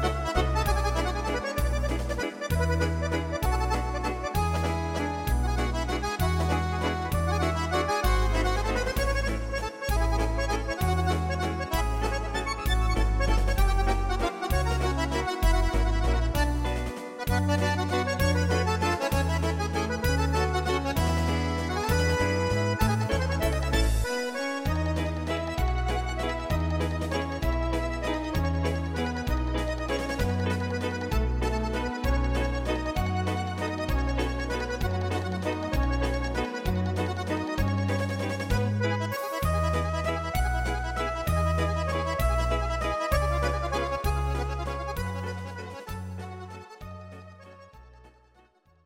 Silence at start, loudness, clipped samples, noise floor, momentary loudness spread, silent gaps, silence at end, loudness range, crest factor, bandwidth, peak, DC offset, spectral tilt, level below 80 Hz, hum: 0 s; -28 LUFS; under 0.1%; -61 dBFS; 5 LU; none; 0.75 s; 3 LU; 16 dB; 16.5 kHz; -10 dBFS; under 0.1%; -5.5 dB/octave; -32 dBFS; none